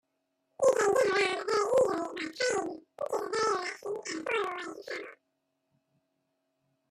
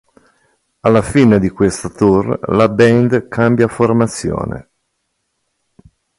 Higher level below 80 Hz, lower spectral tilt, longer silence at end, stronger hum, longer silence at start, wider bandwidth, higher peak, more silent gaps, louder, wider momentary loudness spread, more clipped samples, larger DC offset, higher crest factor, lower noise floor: second, -74 dBFS vs -40 dBFS; second, -2.5 dB/octave vs -7 dB/octave; first, 1.75 s vs 1.6 s; neither; second, 0.6 s vs 0.85 s; first, 13.5 kHz vs 11.5 kHz; second, -14 dBFS vs 0 dBFS; neither; second, -30 LUFS vs -13 LUFS; first, 14 LU vs 9 LU; neither; neither; about the same, 18 dB vs 14 dB; first, -80 dBFS vs -69 dBFS